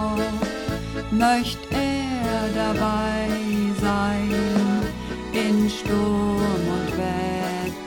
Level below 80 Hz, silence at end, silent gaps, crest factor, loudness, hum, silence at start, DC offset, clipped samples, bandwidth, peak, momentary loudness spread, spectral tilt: -38 dBFS; 0 s; none; 16 dB; -23 LUFS; none; 0 s; under 0.1%; under 0.1%; 17.5 kHz; -6 dBFS; 6 LU; -5.5 dB/octave